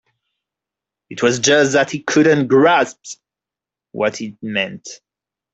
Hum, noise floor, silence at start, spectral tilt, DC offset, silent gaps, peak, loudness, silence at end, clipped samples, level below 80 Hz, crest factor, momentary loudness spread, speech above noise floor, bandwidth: none; -88 dBFS; 1.1 s; -4 dB/octave; under 0.1%; none; -2 dBFS; -16 LUFS; 0.6 s; under 0.1%; -62 dBFS; 16 dB; 22 LU; 72 dB; 8.2 kHz